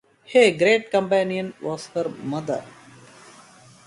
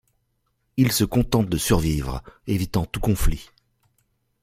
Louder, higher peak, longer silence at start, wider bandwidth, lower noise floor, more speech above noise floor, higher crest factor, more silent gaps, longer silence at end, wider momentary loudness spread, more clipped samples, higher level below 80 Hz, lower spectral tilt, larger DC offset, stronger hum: about the same, -22 LUFS vs -23 LUFS; about the same, -4 dBFS vs -4 dBFS; second, 0.3 s vs 0.75 s; second, 11.5 kHz vs 16.5 kHz; second, -49 dBFS vs -71 dBFS; second, 28 dB vs 50 dB; about the same, 20 dB vs 20 dB; neither; first, 1.15 s vs 1 s; about the same, 13 LU vs 11 LU; neither; second, -66 dBFS vs -32 dBFS; about the same, -4.5 dB/octave vs -5.5 dB/octave; neither; neither